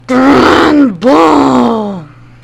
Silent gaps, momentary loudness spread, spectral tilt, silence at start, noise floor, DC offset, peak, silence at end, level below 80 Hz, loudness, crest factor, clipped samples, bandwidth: none; 11 LU; -5.5 dB/octave; 0.1 s; -27 dBFS; under 0.1%; 0 dBFS; 0.4 s; -38 dBFS; -7 LUFS; 8 dB; 5%; 12 kHz